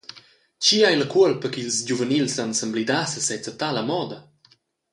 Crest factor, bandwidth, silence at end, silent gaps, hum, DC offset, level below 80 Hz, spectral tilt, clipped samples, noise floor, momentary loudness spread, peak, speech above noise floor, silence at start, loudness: 18 dB; 11.5 kHz; 0.7 s; none; none; under 0.1%; -68 dBFS; -3 dB/octave; under 0.1%; -60 dBFS; 10 LU; -4 dBFS; 38 dB; 0.15 s; -22 LUFS